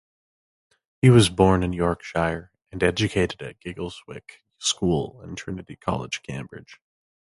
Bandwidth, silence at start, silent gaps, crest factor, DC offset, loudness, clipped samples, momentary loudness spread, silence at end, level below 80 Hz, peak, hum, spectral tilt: 11.5 kHz; 1.05 s; none; 22 dB; under 0.1%; -23 LUFS; under 0.1%; 20 LU; 0.6 s; -44 dBFS; -4 dBFS; none; -5.5 dB/octave